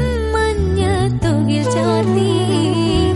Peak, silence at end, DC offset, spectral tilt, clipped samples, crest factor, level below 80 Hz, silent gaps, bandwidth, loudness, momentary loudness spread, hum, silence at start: -4 dBFS; 0 s; under 0.1%; -6.5 dB/octave; under 0.1%; 10 dB; -28 dBFS; none; 11.5 kHz; -16 LUFS; 2 LU; none; 0 s